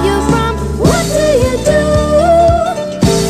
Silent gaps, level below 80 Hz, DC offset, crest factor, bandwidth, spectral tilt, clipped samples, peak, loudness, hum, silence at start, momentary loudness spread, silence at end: none; -22 dBFS; 0.4%; 10 dB; 13 kHz; -5.5 dB/octave; under 0.1%; 0 dBFS; -11 LUFS; none; 0 s; 5 LU; 0 s